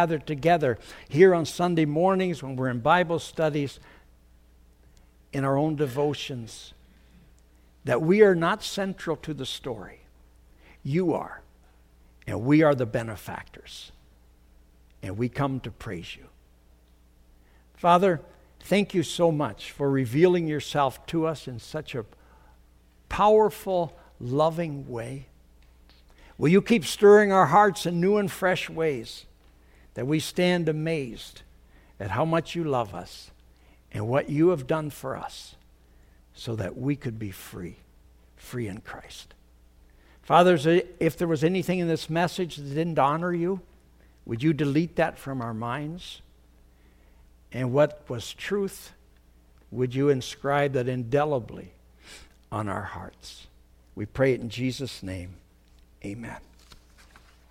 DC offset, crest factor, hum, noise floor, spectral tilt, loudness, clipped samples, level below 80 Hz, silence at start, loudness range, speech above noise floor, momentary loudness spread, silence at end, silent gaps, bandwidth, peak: under 0.1%; 22 dB; none; -57 dBFS; -6 dB/octave; -25 LUFS; under 0.1%; -54 dBFS; 0 s; 10 LU; 32 dB; 20 LU; 0.75 s; none; 16 kHz; -4 dBFS